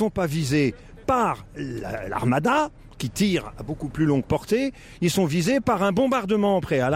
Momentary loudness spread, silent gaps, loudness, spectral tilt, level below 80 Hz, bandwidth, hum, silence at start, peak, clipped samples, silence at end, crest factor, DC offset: 11 LU; none; -24 LUFS; -6 dB/octave; -46 dBFS; 16 kHz; none; 0 s; -10 dBFS; under 0.1%; 0 s; 14 dB; under 0.1%